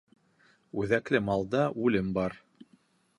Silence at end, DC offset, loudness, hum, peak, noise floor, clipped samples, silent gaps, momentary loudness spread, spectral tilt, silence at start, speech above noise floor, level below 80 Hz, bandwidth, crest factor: 0.8 s; under 0.1%; -29 LUFS; none; -10 dBFS; -66 dBFS; under 0.1%; none; 9 LU; -7.5 dB/octave; 0.75 s; 37 dB; -58 dBFS; 11 kHz; 22 dB